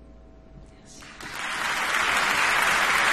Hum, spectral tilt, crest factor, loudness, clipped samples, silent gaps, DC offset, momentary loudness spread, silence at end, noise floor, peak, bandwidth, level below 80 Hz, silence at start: none; -0.5 dB/octave; 18 dB; -22 LUFS; under 0.1%; none; under 0.1%; 17 LU; 0 s; -48 dBFS; -8 dBFS; 13 kHz; -52 dBFS; 0 s